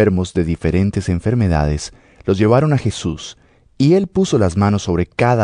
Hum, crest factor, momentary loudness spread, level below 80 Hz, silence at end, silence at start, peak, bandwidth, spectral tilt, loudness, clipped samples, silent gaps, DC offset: none; 14 dB; 11 LU; -32 dBFS; 0 s; 0 s; -2 dBFS; 10.5 kHz; -7 dB/octave; -17 LUFS; under 0.1%; none; under 0.1%